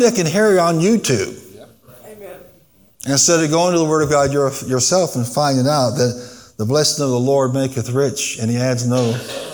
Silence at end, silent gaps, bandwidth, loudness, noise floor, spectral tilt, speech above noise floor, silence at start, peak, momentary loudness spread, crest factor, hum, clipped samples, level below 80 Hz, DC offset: 0 s; none; 19.5 kHz; -16 LUFS; -52 dBFS; -4.5 dB/octave; 35 dB; 0 s; -2 dBFS; 13 LU; 16 dB; none; under 0.1%; -54 dBFS; 0.1%